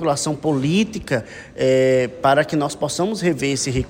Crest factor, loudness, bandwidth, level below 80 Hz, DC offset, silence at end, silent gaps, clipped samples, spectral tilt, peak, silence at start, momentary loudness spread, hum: 16 dB; -19 LUFS; 16.5 kHz; -44 dBFS; under 0.1%; 0 s; none; under 0.1%; -5 dB/octave; -4 dBFS; 0 s; 7 LU; none